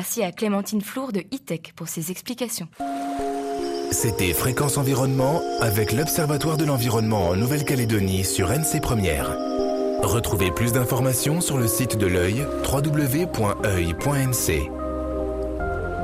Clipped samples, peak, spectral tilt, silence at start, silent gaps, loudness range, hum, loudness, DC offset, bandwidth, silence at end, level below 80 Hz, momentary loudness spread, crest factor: under 0.1%; -10 dBFS; -5 dB/octave; 0 s; none; 5 LU; none; -23 LUFS; under 0.1%; 15.5 kHz; 0 s; -40 dBFS; 7 LU; 14 dB